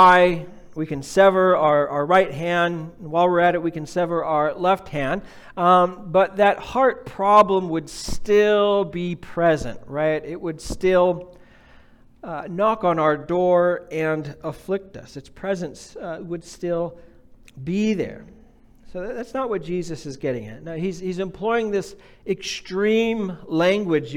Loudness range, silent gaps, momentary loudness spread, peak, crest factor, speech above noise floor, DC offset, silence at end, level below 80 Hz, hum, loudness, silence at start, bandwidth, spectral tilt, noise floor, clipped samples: 10 LU; none; 16 LU; -4 dBFS; 18 dB; 29 dB; under 0.1%; 0 s; -46 dBFS; none; -21 LUFS; 0 s; 15 kHz; -6 dB/octave; -50 dBFS; under 0.1%